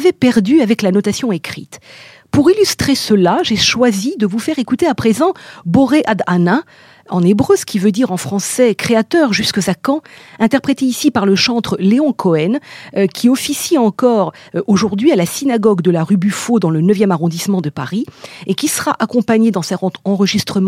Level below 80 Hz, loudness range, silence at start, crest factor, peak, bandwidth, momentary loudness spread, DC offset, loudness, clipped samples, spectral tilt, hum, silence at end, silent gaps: -50 dBFS; 2 LU; 0 s; 14 dB; 0 dBFS; 16.5 kHz; 7 LU; under 0.1%; -14 LUFS; under 0.1%; -5 dB/octave; none; 0 s; none